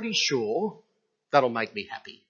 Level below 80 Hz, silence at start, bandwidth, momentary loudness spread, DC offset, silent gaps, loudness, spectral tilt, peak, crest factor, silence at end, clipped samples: -78 dBFS; 0 s; 7.4 kHz; 11 LU; under 0.1%; none; -26 LUFS; -3 dB/octave; -6 dBFS; 22 dB; 0.15 s; under 0.1%